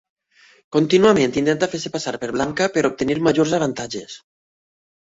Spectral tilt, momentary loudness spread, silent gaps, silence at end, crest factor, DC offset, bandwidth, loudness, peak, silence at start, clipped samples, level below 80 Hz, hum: -5 dB/octave; 14 LU; none; 0.85 s; 16 dB; under 0.1%; 8 kHz; -19 LUFS; -4 dBFS; 0.7 s; under 0.1%; -54 dBFS; none